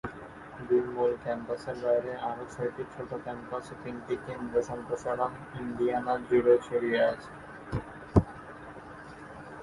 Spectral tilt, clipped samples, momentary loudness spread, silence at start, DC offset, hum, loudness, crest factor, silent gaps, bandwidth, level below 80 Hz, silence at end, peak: -7.5 dB/octave; under 0.1%; 19 LU; 0.05 s; under 0.1%; none; -31 LUFS; 24 dB; none; 11.5 kHz; -50 dBFS; 0 s; -8 dBFS